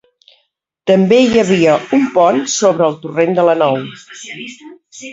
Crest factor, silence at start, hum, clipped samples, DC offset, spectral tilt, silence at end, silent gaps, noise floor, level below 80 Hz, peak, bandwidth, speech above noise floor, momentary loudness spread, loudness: 14 dB; 0.85 s; none; under 0.1%; under 0.1%; -5 dB/octave; 0 s; none; -64 dBFS; -54 dBFS; 0 dBFS; 8 kHz; 51 dB; 19 LU; -12 LUFS